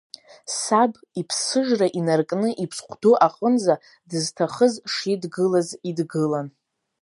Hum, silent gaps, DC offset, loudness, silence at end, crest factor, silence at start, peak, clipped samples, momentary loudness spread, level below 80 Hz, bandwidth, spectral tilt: none; none; under 0.1%; -22 LUFS; 0.5 s; 20 dB; 0.45 s; -2 dBFS; under 0.1%; 10 LU; -74 dBFS; 11.5 kHz; -4.5 dB/octave